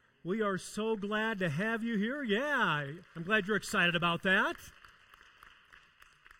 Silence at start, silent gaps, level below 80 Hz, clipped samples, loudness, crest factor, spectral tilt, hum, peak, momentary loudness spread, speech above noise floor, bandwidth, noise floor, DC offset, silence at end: 0.25 s; none; -66 dBFS; under 0.1%; -32 LUFS; 18 dB; -4.5 dB/octave; none; -16 dBFS; 7 LU; 29 dB; 16.5 kHz; -62 dBFS; under 0.1%; 1.7 s